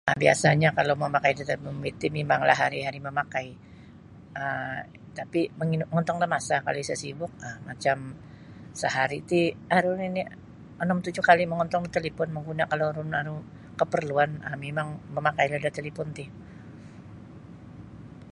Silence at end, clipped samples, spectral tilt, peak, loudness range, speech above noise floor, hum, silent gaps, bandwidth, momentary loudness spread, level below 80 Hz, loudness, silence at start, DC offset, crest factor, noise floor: 0 s; under 0.1%; -5.5 dB/octave; -4 dBFS; 6 LU; 21 dB; none; none; 11.5 kHz; 24 LU; -58 dBFS; -27 LUFS; 0.05 s; under 0.1%; 24 dB; -48 dBFS